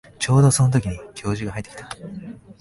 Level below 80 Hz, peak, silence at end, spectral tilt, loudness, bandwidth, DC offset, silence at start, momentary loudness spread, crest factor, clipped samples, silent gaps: -44 dBFS; -6 dBFS; 0.25 s; -5.5 dB/octave; -20 LUFS; 11.5 kHz; under 0.1%; 0.2 s; 20 LU; 16 dB; under 0.1%; none